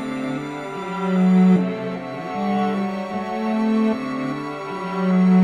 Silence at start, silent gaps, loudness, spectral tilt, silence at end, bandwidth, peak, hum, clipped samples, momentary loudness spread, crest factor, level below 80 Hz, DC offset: 0 s; none; -22 LUFS; -8.5 dB/octave; 0 s; 7.4 kHz; -6 dBFS; none; under 0.1%; 13 LU; 14 dB; -64 dBFS; under 0.1%